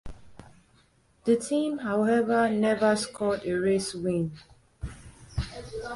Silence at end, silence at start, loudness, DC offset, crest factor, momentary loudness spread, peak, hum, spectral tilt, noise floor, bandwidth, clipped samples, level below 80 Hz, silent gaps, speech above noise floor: 0 s; 0.05 s; -27 LUFS; under 0.1%; 16 dB; 15 LU; -12 dBFS; none; -5.5 dB/octave; -63 dBFS; 11.5 kHz; under 0.1%; -48 dBFS; none; 37 dB